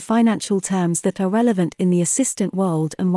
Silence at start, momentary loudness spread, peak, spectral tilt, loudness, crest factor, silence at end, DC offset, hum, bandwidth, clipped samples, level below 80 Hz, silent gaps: 0 s; 4 LU; -6 dBFS; -5.5 dB/octave; -19 LUFS; 12 dB; 0 s; under 0.1%; none; 12 kHz; under 0.1%; -64 dBFS; none